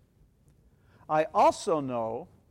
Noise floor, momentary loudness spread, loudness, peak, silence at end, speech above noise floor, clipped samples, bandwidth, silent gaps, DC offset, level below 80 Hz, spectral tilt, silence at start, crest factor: -62 dBFS; 11 LU; -27 LUFS; -14 dBFS; 0.25 s; 36 dB; under 0.1%; 13 kHz; none; under 0.1%; -64 dBFS; -5 dB/octave; 1.1 s; 16 dB